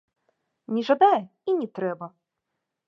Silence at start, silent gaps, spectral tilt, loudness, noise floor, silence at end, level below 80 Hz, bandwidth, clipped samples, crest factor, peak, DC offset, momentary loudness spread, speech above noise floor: 0.7 s; none; -7 dB/octave; -24 LUFS; -82 dBFS; 0.8 s; -84 dBFS; 7 kHz; under 0.1%; 20 dB; -6 dBFS; under 0.1%; 14 LU; 59 dB